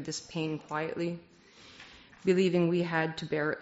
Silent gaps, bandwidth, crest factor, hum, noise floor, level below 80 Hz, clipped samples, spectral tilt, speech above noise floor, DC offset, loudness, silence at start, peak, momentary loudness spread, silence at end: none; 8 kHz; 18 dB; none; -54 dBFS; -68 dBFS; under 0.1%; -5 dB/octave; 24 dB; under 0.1%; -31 LUFS; 0 s; -14 dBFS; 23 LU; 0 s